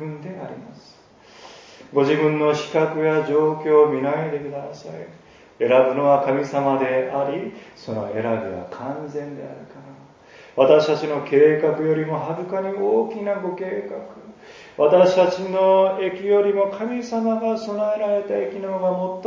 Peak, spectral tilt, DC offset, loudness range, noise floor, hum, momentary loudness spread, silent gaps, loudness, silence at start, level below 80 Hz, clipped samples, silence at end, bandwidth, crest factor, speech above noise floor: -2 dBFS; -7 dB/octave; under 0.1%; 5 LU; -49 dBFS; none; 18 LU; none; -20 LUFS; 0 s; -66 dBFS; under 0.1%; 0 s; 7.4 kHz; 20 dB; 29 dB